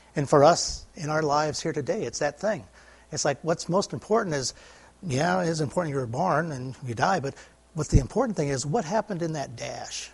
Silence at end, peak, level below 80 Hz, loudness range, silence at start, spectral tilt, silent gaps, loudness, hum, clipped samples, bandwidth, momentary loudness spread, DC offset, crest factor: 0.05 s; -4 dBFS; -42 dBFS; 3 LU; 0.15 s; -5 dB/octave; none; -26 LUFS; none; under 0.1%; 11.5 kHz; 11 LU; under 0.1%; 22 dB